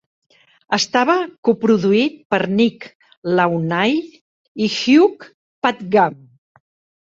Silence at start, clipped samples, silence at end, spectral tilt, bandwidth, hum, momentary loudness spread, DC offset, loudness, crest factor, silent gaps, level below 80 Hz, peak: 0.7 s; under 0.1%; 0.85 s; -5 dB/octave; 7.8 kHz; none; 9 LU; under 0.1%; -17 LUFS; 18 dB; 1.38-1.43 s, 2.25-2.30 s, 2.95-3.00 s, 3.17-3.22 s, 4.21-4.55 s, 5.34-5.62 s; -62 dBFS; 0 dBFS